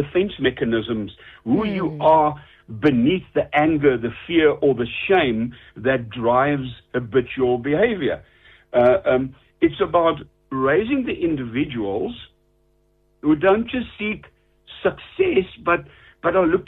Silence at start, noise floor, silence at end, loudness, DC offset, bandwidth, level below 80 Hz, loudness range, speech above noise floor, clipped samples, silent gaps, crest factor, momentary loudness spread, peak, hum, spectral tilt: 0 s; -62 dBFS; 0.05 s; -20 LUFS; under 0.1%; 4.7 kHz; -48 dBFS; 4 LU; 42 dB; under 0.1%; none; 16 dB; 10 LU; -4 dBFS; none; -9 dB/octave